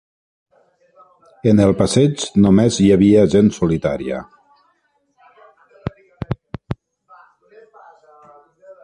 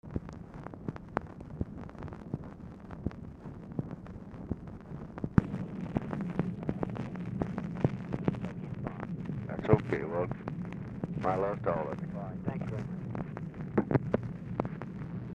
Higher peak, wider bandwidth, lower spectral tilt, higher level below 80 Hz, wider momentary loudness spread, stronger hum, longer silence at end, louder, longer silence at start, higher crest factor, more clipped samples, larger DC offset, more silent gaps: first, -2 dBFS vs -6 dBFS; first, 10.5 kHz vs 8.4 kHz; second, -6.5 dB/octave vs -9.5 dB/octave; first, -42 dBFS vs -52 dBFS; first, 20 LU vs 14 LU; neither; about the same, 0.1 s vs 0 s; first, -15 LUFS vs -36 LUFS; first, 1.45 s vs 0.05 s; second, 16 dB vs 28 dB; neither; neither; neither